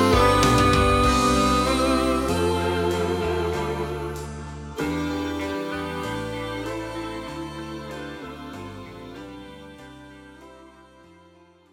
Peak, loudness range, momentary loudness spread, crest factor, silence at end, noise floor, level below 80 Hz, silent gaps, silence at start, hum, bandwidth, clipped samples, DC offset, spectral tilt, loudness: -6 dBFS; 18 LU; 21 LU; 18 dB; 1.05 s; -54 dBFS; -36 dBFS; none; 0 s; none; 17.5 kHz; under 0.1%; under 0.1%; -5 dB/octave; -23 LUFS